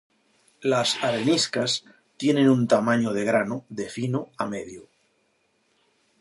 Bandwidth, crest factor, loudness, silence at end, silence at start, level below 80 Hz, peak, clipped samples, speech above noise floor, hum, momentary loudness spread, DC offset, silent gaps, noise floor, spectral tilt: 11.5 kHz; 18 dB; -24 LUFS; 1.4 s; 0.6 s; -68 dBFS; -6 dBFS; under 0.1%; 45 dB; none; 11 LU; under 0.1%; none; -69 dBFS; -4.5 dB/octave